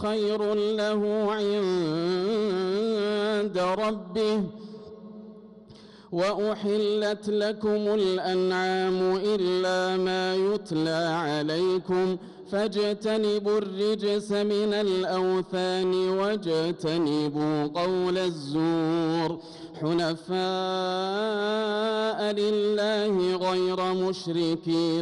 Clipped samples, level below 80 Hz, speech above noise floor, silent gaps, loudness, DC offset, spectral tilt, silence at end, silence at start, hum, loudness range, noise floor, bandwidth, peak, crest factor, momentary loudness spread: under 0.1%; -66 dBFS; 23 dB; none; -26 LUFS; under 0.1%; -6 dB/octave; 0 s; 0 s; none; 3 LU; -49 dBFS; 11.5 kHz; -18 dBFS; 8 dB; 3 LU